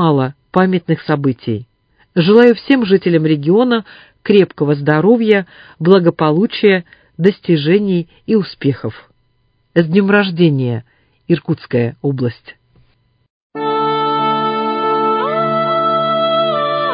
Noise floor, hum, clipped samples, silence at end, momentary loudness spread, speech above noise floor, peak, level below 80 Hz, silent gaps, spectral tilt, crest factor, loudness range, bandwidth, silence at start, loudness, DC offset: -60 dBFS; none; under 0.1%; 0 s; 8 LU; 46 dB; 0 dBFS; -56 dBFS; 13.30-13.50 s; -9.5 dB/octave; 14 dB; 6 LU; 5.2 kHz; 0 s; -14 LUFS; under 0.1%